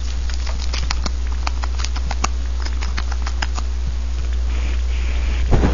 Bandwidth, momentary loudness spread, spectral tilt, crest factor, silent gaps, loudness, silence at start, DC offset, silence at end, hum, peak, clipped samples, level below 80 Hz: 7.4 kHz; 2 LU; -5 dB/octave; 20 dB; none; -23 LUFS; 0 s; 4%; 0 s; 60 Hz at -20 dBFS; 0 dBFS; under 0.1%; -20 dBFS